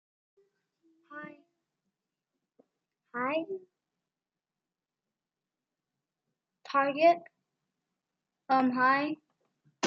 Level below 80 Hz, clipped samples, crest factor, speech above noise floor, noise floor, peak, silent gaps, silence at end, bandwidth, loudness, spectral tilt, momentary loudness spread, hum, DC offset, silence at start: under -90 dBFS; under 0.1%; 22 dB; over 62 dB; under -90 dBFS; -12 dBFS; none; 0 s; 7.4 kHz; -28 LUFS; -2 dB/octave; 21 LU; none; under 0.1%; 1.1 s